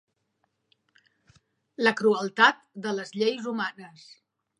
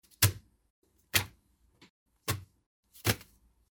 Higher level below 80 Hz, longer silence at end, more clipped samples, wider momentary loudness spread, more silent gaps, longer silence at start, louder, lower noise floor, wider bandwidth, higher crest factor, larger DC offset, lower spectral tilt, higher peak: second, -80 dBFS vs -56 dBFS; about the same, 0.7 s vs 0.6 s; neither; first, 21 LU vs 13 LU; second, none vs 0.70-0.82 s, 1.90-2.06 s, 2.66-2.83 s; first, 1.8 s vs 0.2 s; first, -25 LUFS vs -32 LUFS; first, -76 dBFS vs -68 dBFS; second, 11 kHz vs over 20 kHz; second, 24 dB vs 30 dB; neither; first, -4 dB/octave vs -2.5 dB/octave; first, -4 dBFS vs -8 dBFS